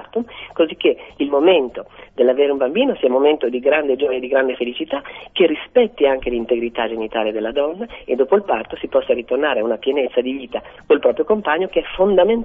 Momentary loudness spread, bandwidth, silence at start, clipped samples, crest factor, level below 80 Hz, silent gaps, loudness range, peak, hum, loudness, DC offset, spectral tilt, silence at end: 10 LU; 3.8 kHz; 0 s; under 0.1%; 16 dB; -48 dBFS; none; 3 LU; -2 dBFS; none; -18 LUFS; under 0.1%; -8 dB/octave; 0 s